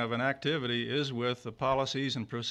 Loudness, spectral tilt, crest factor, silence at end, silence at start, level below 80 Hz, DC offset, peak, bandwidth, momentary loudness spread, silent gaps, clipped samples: -32 LUFS; -5 dB/octave; 16 dB; 0 s; 0 s; -64 dBFS; under 0.1%; -16 dBFS; 11.5 kHz; 4 LU; none; under 0.1%